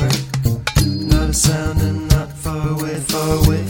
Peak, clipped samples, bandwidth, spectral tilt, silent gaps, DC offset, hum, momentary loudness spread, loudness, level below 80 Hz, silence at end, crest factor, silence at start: 0 dBFS; under 0.1%; over 20 kHz; -5 dB/octave; none; under 0.1%; none; 6 LU; -18 LUFS; -24 dBFS; 0 s; 16 dB; 0 s